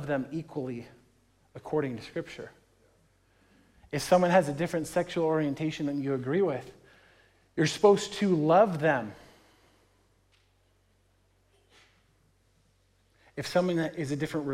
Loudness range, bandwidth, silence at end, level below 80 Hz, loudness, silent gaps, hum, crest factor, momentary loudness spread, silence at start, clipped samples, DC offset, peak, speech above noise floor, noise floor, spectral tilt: 11 LU; 16 kHz; 0 s; -66 dBFS; -28 LUFS; none; none; 20 dB; 17 LU; 0 s; under 0.1%; under 0.1%; -10 dBFS; 40 dB; -68 dBFS; -6 dB/octave